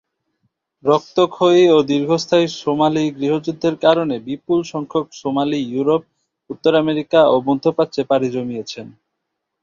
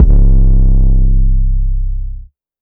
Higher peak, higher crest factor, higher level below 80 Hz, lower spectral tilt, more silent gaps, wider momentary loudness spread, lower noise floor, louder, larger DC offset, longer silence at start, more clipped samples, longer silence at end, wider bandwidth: about the same, -2 dBFS vs 0 dBFS; first, 16 dB vs 8 dB; second, -60 dBFS vs -8 dBFS; second, -6 dB/octave vs -13.5 dB/octave; neither; second, 10 LU vs 14 LU; first, -77 dBFS vs -29 dBFS; second, -17 LUFS vs -14 LUFS; neither; first, 0.85 s vs 0 s; second, under 0.1% vs 0.5%; first, 0.75 s vs 0.4 s; first, 7.6 kHz vs 1 kHz